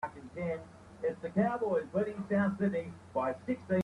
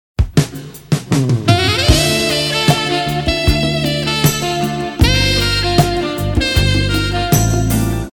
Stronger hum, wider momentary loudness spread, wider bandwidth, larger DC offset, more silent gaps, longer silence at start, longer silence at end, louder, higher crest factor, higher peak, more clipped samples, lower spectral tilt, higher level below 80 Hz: neither; first, 9 LU vs 6 LU; second, 10.5 kHz vs 19 kHz; neither; neither; second, 0 s vs 0.2 s; about the same, 0 s vs 0.05 s; second, -34 LUFS vs -14 LUFS; about the same, 18 dB vs 14 dB; second, -16 dBFS vs 0 dBFS; neither; first, -8.5 dB/octave vs -4.5 dB/octave; second, -66 dBFS vs -24 dBFS